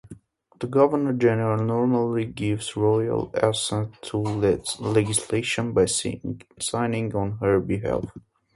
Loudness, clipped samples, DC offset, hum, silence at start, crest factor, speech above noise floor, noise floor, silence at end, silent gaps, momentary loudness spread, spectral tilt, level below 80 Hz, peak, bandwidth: -24 LUFS; under 0.1%; under 0.1%; none; 0.05 s; 20 dB; 24 dB; -47 dBFS; 0.35 s; none; 8 LU; -5 dB/octave; -50 dBFS; -4 dBFS; 11.5 kHz